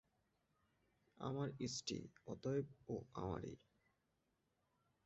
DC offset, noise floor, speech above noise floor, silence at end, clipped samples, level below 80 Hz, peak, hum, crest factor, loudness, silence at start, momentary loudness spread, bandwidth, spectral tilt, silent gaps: under 0.1%; -85 dBFS; 39 dB; 1.5 s; under 0.1%; -70 dBFS; -30 dBFS; none; 18 dB; -47 LUFS; 1.2 s; 8 LU; 7.4 kHz; -6 dB/octave; none